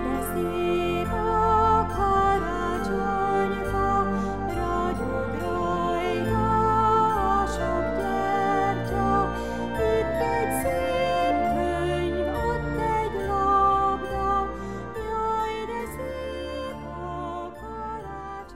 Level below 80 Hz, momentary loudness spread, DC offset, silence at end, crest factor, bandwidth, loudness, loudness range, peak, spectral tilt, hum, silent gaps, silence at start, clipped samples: -38 dBFS; 12 LU; 0.7%; 0 s; 14 dB; 16 kHz; -25 LUFS; 6 LU; -10 dBFS; -6 dB/octave; none; none; 0 s; under 0.1%